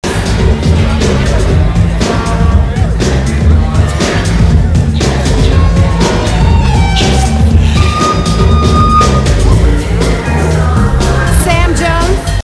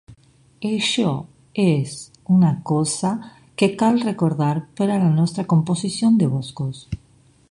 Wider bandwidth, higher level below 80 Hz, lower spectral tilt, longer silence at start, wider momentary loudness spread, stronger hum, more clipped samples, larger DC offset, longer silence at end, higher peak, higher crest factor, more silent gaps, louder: about the same, 11 kHz vs 11.5 kHz; first, -12 dBFS vs -52 dBFS; about the same, -6 dB/octave vs -6 dB/octave; about the same, 0 s vs 0.1 s; second, 3 LU vs 13 LU; neither; first, 0.7% vs under 0.1%; first, 0.4% vs under 0.1%; second, 0.05 s vs 0.55 s; about the same, 0 dBFS vs -2 dBFS; second, 8 dB vs 18 dB; neither; first, -10 LUFS vs -20 LUFS